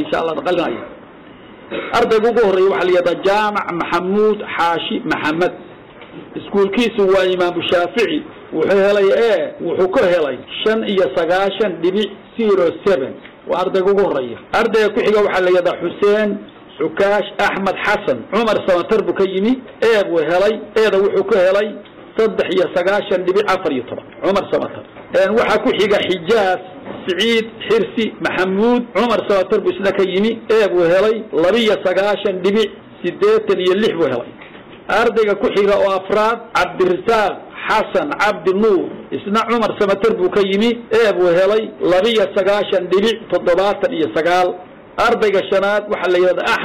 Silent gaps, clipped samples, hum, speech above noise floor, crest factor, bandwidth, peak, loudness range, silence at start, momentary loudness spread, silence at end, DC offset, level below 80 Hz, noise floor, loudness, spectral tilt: none; under 0.1%; none; 23 dB; 10 dB; 13.5 kHz; -6 dBFS; 2 LU; 0 s; 7 LU; 0 s; 0.2%; -50 dBFS; -39 dBFS; -16 LUFS; -5.5 dB/octave